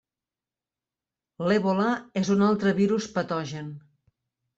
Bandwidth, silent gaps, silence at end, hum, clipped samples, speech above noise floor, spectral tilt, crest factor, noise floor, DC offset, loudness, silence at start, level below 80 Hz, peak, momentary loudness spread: 7.8 kHz; none; 0.8 s; none; under 0.1%; over 65 dB; -6.5 dB/octave; 16 dB; under -90 dBFS; under 0.1%; -25 LUFS; 1.4 s; -66 dBFS; -12 dBFS; 11 LU